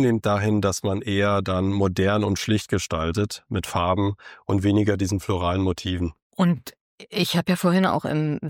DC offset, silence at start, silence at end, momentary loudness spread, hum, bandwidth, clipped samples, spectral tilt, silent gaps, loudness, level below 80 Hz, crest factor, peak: under 0.1%; 0 s; 0 s; 7 LU; none; 17 kHz; under 0.1%; -6 dB/octave; 6.22-6.30 s, 6.81-6.98 s; -23 LUFS; -46 dBFS; 14 dB; -8 dBFS